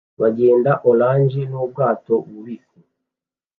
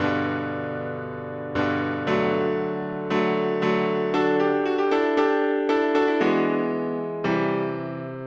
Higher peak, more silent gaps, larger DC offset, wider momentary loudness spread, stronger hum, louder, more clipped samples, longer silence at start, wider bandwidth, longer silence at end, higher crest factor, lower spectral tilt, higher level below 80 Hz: first, -2 dBFS vs -8 dBFS; neither; neither; first, 19 LU vs 8 LU; neither; first, -17 LUFS vs -24 LUFS; neither; first, 0.2 s vs 0 s; second, 4.3 kHz vs 7.6 kHz; first, 1.05 s vs 0 s; about the same, 16 dB vs 14 dB; first, -11.5 dB/octave vs -7 dB/octave; about the same, -66 dBFS vs -62 dBFS